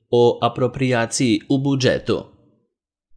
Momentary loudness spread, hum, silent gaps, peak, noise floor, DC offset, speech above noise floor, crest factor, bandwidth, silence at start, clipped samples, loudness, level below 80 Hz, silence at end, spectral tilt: 5 LU; none; none; -2 dBFS; -75 dBFS; under 0.1%; 56 dB; 18 dB; 10.5 kHz; 0.1 s; under 0.1%; -19 LUFS; -52 dBFS; 0.95 s; -5.5 dB/octave